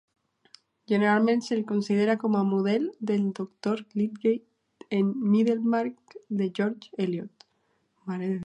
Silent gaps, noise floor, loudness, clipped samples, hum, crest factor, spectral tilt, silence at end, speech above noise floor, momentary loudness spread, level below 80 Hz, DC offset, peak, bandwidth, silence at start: none; -72 dBFS; -27 LUFS; under 0.1%; none; 18 dB; -7.5 dB/octave; 0 s; 46 dB; 10 LU; -78 dBFS; under 0.1%; -10 dBFS; 8.6 kHz; 0.9 s